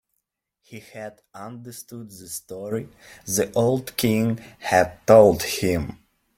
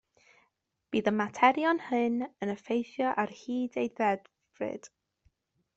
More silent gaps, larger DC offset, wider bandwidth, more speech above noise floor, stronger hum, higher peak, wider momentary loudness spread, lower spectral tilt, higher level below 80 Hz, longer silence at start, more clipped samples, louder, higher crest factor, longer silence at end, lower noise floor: neither; neither; first, 16.5 kHz vs 8 kHz; first, 56 dB vs 46 dB; neither; first, -2 dBFS vs -8 dBFS; first, 24 LU vs 13 LU; about the same, -5 dB/octave vs -5.5 dB/octave; first, -52 dBFS vs -74 dBFS; second, 0.7 s vs 0.9 s; neither; first, -21 LUFS vs -30 LUFS; about the same, 20 dB vs 24 dB; second, 0.45 s vs 0.9 s; about the same, -78 dBFS vs -76 dBFS